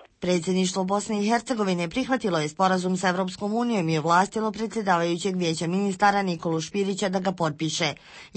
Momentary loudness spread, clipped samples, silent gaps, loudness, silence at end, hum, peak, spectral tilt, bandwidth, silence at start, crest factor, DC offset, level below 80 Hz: 6 LU; under 0.1%; none; -25 LUFS; 0.1 s; none; -8 dBFS; -5 dB/octave; 8.8 kHz; 0 s; 18 dB; under 0.1%; -60 dBFS